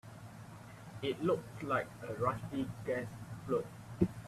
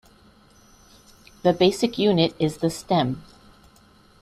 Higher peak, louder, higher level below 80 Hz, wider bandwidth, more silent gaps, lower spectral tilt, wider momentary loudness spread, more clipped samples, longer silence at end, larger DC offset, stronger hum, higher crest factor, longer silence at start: second, -14 dBFS vs -4 dBFS; second, -38 LUFS vs -22 LUFS; second, -62 dBFS vs -56 dBFS; about the same, 14.5 kHz vs 14 kHz; neither; about the same, -7 dB/octave vs -6 dB/octave; first, 16 LU vs 8 LU; neither; second, 0 s vs 1 s; neither; neither; about the same, 24 dB vs 20 dB; second, 0.05 s vs 1.45 s